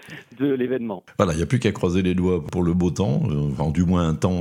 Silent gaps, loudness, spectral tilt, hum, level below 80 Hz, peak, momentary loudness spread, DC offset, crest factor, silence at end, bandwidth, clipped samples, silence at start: none; -22 LUFS; -7.5 dB/octave; none; -44 dBFS; -2 dBFS; 5 LU; under 0.1%; 20 dB; 0 s; 11.5 kHz; under 0.1%; 0.05 s